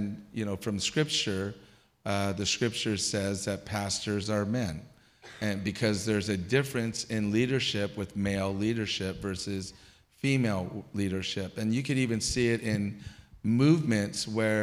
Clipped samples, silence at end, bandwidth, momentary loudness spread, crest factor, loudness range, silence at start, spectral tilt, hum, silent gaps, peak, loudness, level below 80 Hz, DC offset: under 0.1%; 0 s; 15.5 kHz; 9 LU; 18 dB; 3 LU; 0 s; -4.5 dB/octave; none; none; -12 dBFS; -30 LUFS; -56 dBFS; under 0.1%